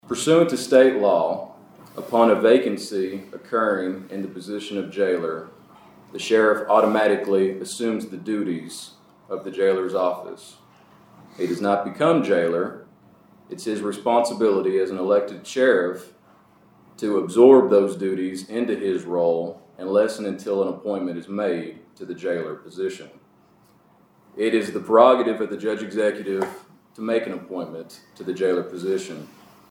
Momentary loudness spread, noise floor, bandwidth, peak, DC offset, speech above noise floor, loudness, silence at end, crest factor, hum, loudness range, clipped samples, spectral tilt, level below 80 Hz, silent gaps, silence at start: 17 LU; -57 dBFS; 16 kHz; -2 dBFS; under 0.1%; 35 dB; -22 LUFS; 0.45 s; 20 dB; none; 8 LU; under 0.1%; -5.5 dB/octave; -76 dBFS; none; 0.05 s